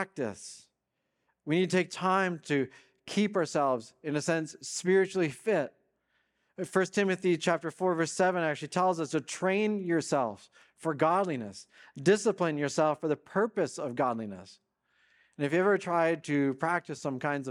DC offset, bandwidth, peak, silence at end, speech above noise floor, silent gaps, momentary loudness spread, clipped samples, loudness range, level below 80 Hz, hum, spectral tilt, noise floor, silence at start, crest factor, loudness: under 0.1%; 12 kHz; -12 dBFS; 0 s; 52 dB; none; 10 LU; under 0.1%; 2 LU; -80 dBFS; none; -5 dB/octave; -82 dBFS; 0 s; 20 dB; -30 LUFS